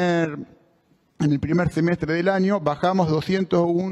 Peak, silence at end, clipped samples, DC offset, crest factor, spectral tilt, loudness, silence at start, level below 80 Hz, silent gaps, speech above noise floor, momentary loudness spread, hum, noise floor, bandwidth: -8 dBFS; 0 s; under 0.1%; under 0.1%; 14 dB; -7.5 dB/octave; -22 LUFS; 0 s; -50 dBFS; none; 41 dB; 3 LU; none; -62 dBFS; 11 kHz